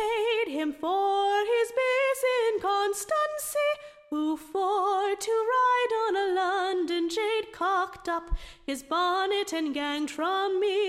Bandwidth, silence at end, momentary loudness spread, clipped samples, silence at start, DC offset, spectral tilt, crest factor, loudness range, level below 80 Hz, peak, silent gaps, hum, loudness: 16 kHz; 0 s; 6 LU; under 0.1%; 0 s; under 0.1%; -2.5 dB/octave; 12 dB; 3 LU; -48 dBFS; -16 dBFS; none; none; -27 LUFS